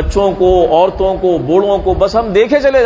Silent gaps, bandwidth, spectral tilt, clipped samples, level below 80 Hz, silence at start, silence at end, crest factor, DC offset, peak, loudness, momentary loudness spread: none; 8 kHz; -6.5 dB/octave; under 0.1%; -26 dBFS; 0 s; 0 s; 10 dB; under 0.1%; 0 dBFS; -12 LUFS; 4 LU